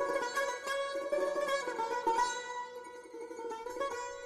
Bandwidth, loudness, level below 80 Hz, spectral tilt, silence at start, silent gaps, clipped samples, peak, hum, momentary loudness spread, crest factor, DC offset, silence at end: 13 kHz; -35 LUFS; -72 dBFS; -1.5 dB/octave; 0 s; none; under 0.1%; -20 dBFS; none; 13 LU; 16 dB; under 0.1%; 0 s